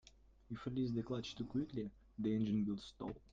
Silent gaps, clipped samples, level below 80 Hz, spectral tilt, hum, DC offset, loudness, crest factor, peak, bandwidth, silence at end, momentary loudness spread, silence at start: none; under 0.1%; -64 dBFS; -7.5 dB/octave; none; under 0.1%; -42 LUFS; 14 dB; -28 dBFS; 7.6 kHz; 0.15 s; 11 LU; 0.5 s